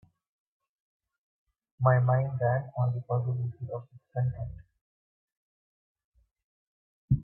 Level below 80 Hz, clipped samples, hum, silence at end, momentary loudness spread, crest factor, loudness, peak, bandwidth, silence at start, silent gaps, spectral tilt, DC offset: -54 dBFS; under 0.1%; none; 0 s; 15 LU; 20 dB; -29 LUFS; -12 dBFS; 2.4 kHz; 1.8 s; 4.81-5.28 s, 5.37-5.95 s, 6.04-6.12 s, 6.44-7.08 s; -13.5 dB/octave; under 0.1%